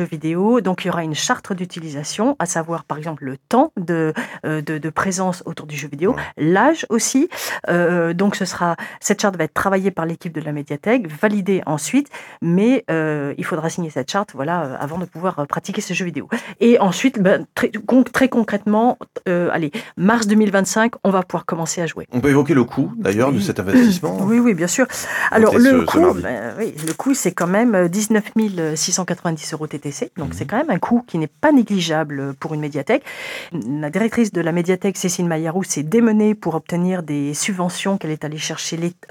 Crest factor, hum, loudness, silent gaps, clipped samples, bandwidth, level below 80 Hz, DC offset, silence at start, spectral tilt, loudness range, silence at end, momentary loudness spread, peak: 18 dB; none; -19 LUFS; none; under 0.1%; 18 kHz; -56 dBFS; under 0.1%; 0 s; -5 dB/octave; 5 LU; 0.2 s; 11 LU; 0 dBFS